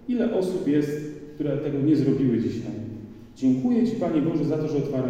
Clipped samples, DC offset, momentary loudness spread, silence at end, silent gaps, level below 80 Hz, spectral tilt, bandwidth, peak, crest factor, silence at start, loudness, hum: under 0.1%; under 0.1%; 13 LU; 0 s; none; -54 dBFS; -8.5 dB/octave; 9.8 kHz; -10 dBFS; 14 dB; 0 s; -24 LUFS; none